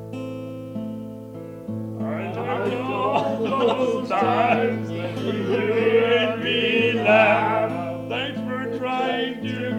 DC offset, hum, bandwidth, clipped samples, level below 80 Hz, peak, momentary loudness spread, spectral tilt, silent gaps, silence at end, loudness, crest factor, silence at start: under 0.1%; none; 13.5 kHz; under 0.1%; -62 dBFS; -4 dBFS; 15 LU; -6.5 dB/octave; none; 0 s; -22 LUFS; 18 dB; 0 s